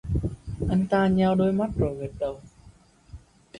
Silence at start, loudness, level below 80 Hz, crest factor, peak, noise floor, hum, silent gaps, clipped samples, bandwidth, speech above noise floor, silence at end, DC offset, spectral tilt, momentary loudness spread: 0.05 s; -25 LUFS; -40 dBFS; 16 dB; -10 dBFS; -54 dBFS; none; none; under 0.1%; 10 kHz; 30 dB; 0 s; under 0.1%; -8.5 dB/octave; 11 LU